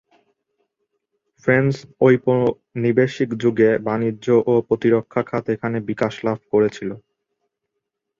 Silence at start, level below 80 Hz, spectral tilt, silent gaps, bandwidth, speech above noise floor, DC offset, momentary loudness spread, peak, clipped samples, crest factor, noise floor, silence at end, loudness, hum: 1.45 s; -58 dBFS; -8 dB/octave; none; 7.4 kHz; 60 dB; under 0.1%; 7 LU; -2 dBFS; under 0.1%; 18 dB; -79 dBFS; 1.2 s; -19 LUFS; none